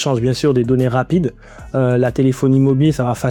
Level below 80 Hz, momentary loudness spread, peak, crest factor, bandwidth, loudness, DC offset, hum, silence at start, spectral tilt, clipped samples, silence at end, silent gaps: -40 dBFS; 5 LU; -4 dBFS; 12 dB; 14.5 kHz; -16 LUFS; under 0.1%; none; 0 s; -7.5 dB/octave; under 0.1%; 0 s; none